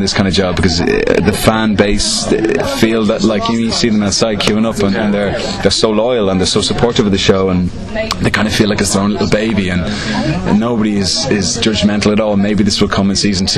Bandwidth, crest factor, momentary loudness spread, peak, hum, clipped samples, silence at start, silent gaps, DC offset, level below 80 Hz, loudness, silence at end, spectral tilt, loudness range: 13 kHz; 12 dB; 3 LU; 0 dBFS; none; under 0.1%; 0 s; none; under 0.1%; -30 dBFS; -13 LUFS; 0 s; -4.5 dB/octave; 1 LU